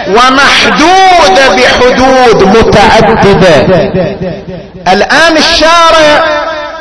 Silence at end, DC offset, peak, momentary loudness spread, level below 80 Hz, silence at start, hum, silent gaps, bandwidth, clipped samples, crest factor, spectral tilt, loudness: 0 s; 5%; 0 dBFS; 10 LU; -26 dBFS; 0 s; none; none; 11 kHz; 10%; 4 dB; -4 dB/octave; -4 LUFS